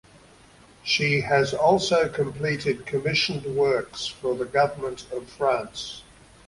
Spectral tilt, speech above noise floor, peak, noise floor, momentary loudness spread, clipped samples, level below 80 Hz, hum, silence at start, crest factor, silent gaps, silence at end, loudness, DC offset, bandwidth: -4.5 dB/octave; 28 dB; -6 dBFS; -52 dBFS; 14 LU; under 0.1%; -56 dBFS; none; 0.85 s; 20 dB; none; 0.45 s; -24 LUFS; under 0.1%; 11.5 kHz